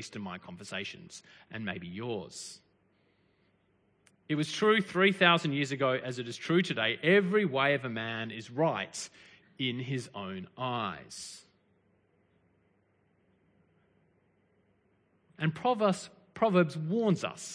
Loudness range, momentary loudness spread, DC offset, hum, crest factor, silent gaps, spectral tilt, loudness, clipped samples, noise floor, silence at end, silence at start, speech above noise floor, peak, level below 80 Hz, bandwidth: 15 LU; 18 LU; under 0.1%; none; 24 dB; none; -5 dB/octave; -30 LUFS; under 0.1%; -71 dBFS; 0 s; 0 s; 40 dB; -8 dBFS; -76 dBFS; 10.5 kHz